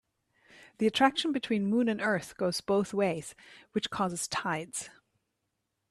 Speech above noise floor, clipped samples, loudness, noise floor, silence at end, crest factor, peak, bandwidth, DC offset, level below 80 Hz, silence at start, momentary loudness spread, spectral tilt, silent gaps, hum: 52 dB; under 0.1%; -30 LUFS; -82 dBFS; 1 s; 22 dB; -10 dBFS; 13 kHz; under 0.1%; -68 dBFS; 0.6 s; 12 LU; -4 dB/octave; none; none